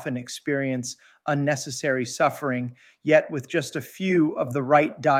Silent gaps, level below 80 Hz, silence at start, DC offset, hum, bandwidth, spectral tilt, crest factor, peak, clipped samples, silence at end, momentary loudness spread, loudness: none; -72 dBFS; 0 s; under 0.1%; none; 16 kHz; -5.5 dB/octave; 20 dB; -6 dBFS; under 0.1%; 0 s; 11 LU; -24 LUFS